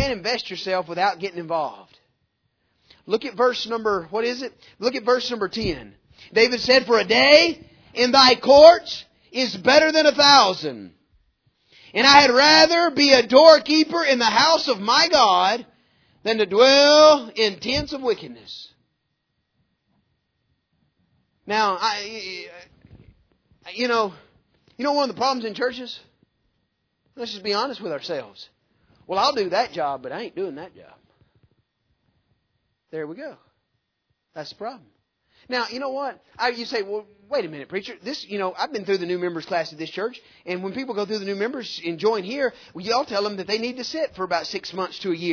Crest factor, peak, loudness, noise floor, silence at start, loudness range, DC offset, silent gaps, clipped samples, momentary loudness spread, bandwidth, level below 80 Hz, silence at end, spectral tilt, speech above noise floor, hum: 22 dB; 0 dBFS; -19 LUFS; -75 dBFS; 0 s; 16 LU; under 0.1%; none; under 0.1%; 20 LU; 5.4 kHz; -56 dBFS; 0 s; -2.5 dB/octave; 55 dB; none